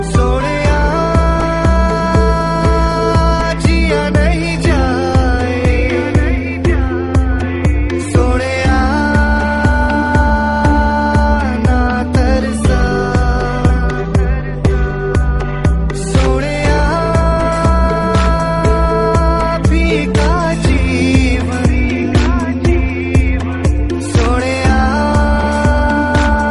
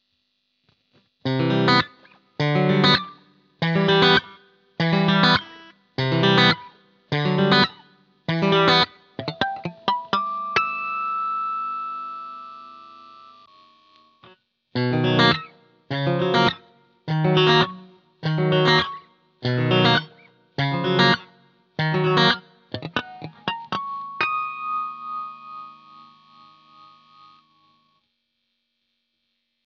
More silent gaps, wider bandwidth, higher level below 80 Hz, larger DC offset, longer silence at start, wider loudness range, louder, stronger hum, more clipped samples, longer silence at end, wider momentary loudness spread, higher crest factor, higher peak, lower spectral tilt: neither; first, 11.5 kHz vs 7.4 kHz; first, -16 dBFS vs -60 dBFS; first, 0.9% vs under 0.1%; second, 0 s vs 1.25 s; second, 2 LU vs 10 LU; first, -13 LUFS vs -21 LUFS; neither; neither; second, 0 s vs 4 s; second, 3 LU vs 18 LU; second, 12 dB vs 20 dB; first, 0 dBFS vs -4 dBFS; about the same, -6.5 dB/octave vs -6 dB/octave